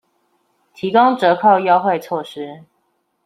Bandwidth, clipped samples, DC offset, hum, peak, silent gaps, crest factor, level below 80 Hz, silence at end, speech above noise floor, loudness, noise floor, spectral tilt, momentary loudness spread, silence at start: 13.5 kHz; under 0.1%; under 0.1%; none; -2 dBFS; none; 16 dB; -68 dBFS; 0.65 s; 51 dB; -15 LUFS; -67 dBFS; -6.5 dB/octave; 17 LU; 0.8 s